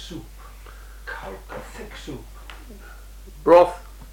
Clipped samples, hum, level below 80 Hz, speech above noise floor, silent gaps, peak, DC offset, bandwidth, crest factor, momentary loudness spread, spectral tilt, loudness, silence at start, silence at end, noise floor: under 0.1%; none; -42 dBFS; 19 dB; none; -4 dBFS; under 0.1%; 16.5 kHz; 20 dB; 29 LU; -5.5 dB/octave; -17 LUFS; 0 s; 0 s; -41 dBFS